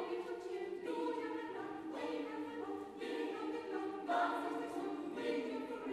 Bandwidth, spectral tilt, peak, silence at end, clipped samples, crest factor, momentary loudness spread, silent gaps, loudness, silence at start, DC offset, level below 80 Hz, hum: 13 kHz; -4.5 dB/octave; -24 dBFS; 0 s; under 0.1%; 18 dB; 7 LU; none; -42 LUFS; 0 s; under 0.1%; -80 dBFS; none